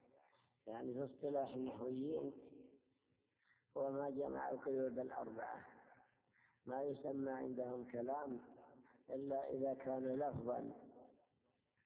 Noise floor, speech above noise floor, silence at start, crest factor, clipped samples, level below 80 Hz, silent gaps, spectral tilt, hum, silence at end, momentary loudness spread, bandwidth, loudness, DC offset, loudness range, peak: -84 dBFS; 39 dB; 0.65 s; 16 dB; under 0.1%; -80 dBFS; none; -7.5 dB/octave; none; 0.75 s; 18 LU; 4 kHz; -46 LUFS; under 0.1%; 2 LU; -30 dBFS